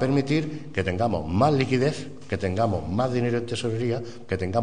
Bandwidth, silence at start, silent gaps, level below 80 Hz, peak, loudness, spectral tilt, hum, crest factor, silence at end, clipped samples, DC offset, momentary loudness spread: 10 kHz; 0 s; none; -50 dBFS; -6 dBFS; -25 LUFS; -7 dB/octave; none; 18 dB; 0 s; under 0.1%; 0.9%; 8 LU